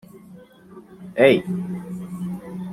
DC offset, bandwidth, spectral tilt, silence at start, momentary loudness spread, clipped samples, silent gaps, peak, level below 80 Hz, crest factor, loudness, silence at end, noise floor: under 0.1%; 14.5 kHz; -7 dB/octave; 0.15 s; 16 LU; under 0.1%; none; -2 dBFS; -60 dBFS; 22 dB; -22 LUFS; 0 s; -46 dBFS